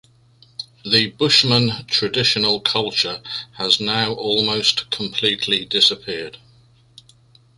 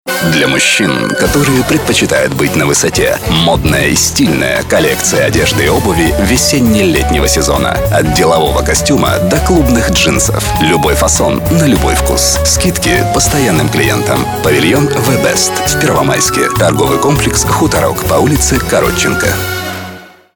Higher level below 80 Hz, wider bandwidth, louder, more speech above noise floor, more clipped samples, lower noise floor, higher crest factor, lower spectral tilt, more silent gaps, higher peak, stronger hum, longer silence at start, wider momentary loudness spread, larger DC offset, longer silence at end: second, -56 dBFS vs -22 dBFS; second, 11.5 kHz vs over 20 kHz; second, -17 LUFS vs -10 LUFS; first, 33 dB vs 20 dB; neither; first, -53 dBFS vs -30 dBFS; first, 20 dB vs 10 dB; about the same, -3.5 dB/octave vs -4 dB/octave; neither; about the same, 0 dBFS vs 0 dBFS; neither; first, 0.6 s vs 0.05 s; first, 15 LU vs 3 LU; neither; first, 1.2 s vs 0.3 s